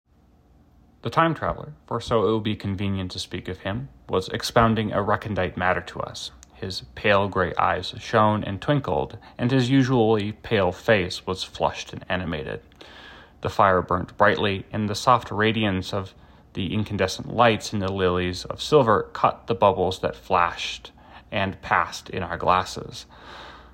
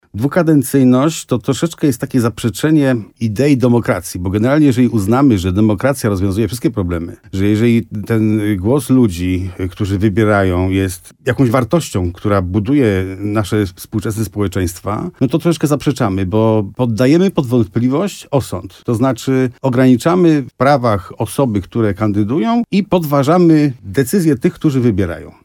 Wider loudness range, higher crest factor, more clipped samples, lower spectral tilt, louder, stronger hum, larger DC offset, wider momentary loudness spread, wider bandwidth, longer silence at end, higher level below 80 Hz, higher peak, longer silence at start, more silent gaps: about the same, 4 LU vs 3 LU; first, 20 dB vs 14 dB; neither; second, -5.5 dB/octave vs -7 dB/octave; second, -23 LUFS vs -15 LUFS; neither; neither; first, 14 LU vs 8 LU; second, 16 kHz vs 18.5 kHz; about the same, 0.1 s vs 0.15 s; second, -48 dBFS vs -42 dBFS; second, -4 dBFS vs 0 dBFS; first, 1.05 s vs 0.15 s; neither